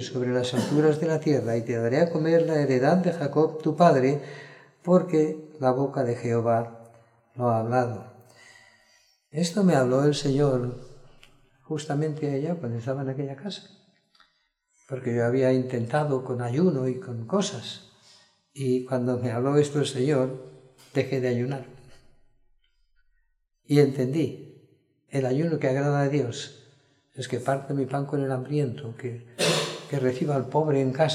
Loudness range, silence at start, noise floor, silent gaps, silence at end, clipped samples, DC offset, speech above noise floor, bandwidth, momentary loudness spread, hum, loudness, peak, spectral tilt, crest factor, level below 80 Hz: 7 LU; 0 s; -71 dBFS; none; 0 s; under 0.1%; under 0.1%; 47 dB; 13.5 kHz; 13 LU; none; -25 LUFS; -6 dBFS; -6.5 dB/octave; 20 dB; -62 dBFS